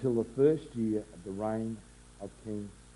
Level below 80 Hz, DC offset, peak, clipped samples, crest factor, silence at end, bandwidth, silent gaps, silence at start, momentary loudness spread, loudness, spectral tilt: -58 dBFS; under 0.1%; -14 dBFS; under 0.1%; 20 dB; 0.05 s; 11.5 kHz; none; 0 s; 18 LU; -33 LUFS; -8 dB/octave